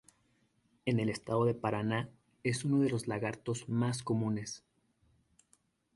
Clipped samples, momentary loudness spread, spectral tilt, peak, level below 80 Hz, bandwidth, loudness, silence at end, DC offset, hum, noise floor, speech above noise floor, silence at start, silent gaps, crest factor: under 0.1%; 8 LU; -6 dB/octave; -16 dBFS; -68 dBFS; 11.5 kHz; -34 LUFS; 1.4 s; under 0.1%; none; -73 dBFS; 40 dB; 0.85 s; none; 20 dB